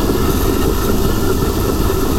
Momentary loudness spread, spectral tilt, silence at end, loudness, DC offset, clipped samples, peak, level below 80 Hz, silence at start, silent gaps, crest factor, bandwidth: 1 LU; -5.5 dB/octave; 0 s; -16 LUFS; under 0.1%; under 0.1%; -2 dBFS; -20 dBFS; 0 s; none; 12 dB; 16.5 kHz